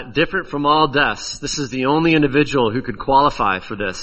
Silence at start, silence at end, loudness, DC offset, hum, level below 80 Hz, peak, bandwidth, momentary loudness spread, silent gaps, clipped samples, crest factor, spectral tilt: 0 s; 0 s; -17 LUFS; under 0.1%; none; -40 dBFS; -2 dBFS; 8.4 kHz; 9 LU; none; under 0.1%; 16 dB; -4.5 dB/octave